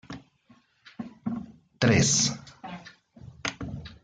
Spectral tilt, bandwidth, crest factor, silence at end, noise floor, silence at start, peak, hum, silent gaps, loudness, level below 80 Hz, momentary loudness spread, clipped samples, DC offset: -3.5 dB/octave; 10 kHz; 22 dB; 0.1 s; -61 dBFS; 0.1 s; -8 dBFS; none; none; -26 LUFS; -56 dBFS; 24 LU; under 0.1%; under 0.1%